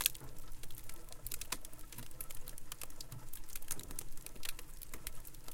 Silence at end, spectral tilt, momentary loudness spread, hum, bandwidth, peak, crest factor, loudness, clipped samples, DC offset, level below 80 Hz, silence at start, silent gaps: 0 s; -1.5 dB/octave; 9 LU; none; 17 kHz; -8 dBFS; 32 dB; -47 LUFS; under 0.1%; under 0.1%; -50 dBFS; 0 s; none